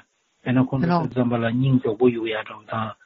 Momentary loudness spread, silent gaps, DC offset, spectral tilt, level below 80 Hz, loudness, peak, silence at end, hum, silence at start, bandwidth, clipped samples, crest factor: 9 LU; none; under 0.1%; -7 dB/octave; -56 dBFS; -22 LUFS; -6 dBFS; 0.1 s; none; 0.45 s; 5.8 kHz; under 0.1%; 16 dB